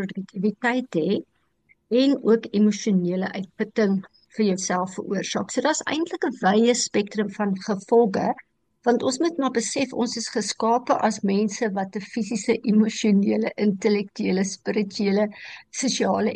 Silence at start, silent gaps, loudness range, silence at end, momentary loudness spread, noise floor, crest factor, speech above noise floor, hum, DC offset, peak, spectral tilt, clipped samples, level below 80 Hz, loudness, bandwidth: 0 s; none; 2 LU; 0 s; 8 LU; -64 dBFS; 16 dB; 41 dB; none; under 0.1%; -6 dBFS; -5 dB/octave; under 0.1%; -70 dBFS; -23 LUFS; 10 kHz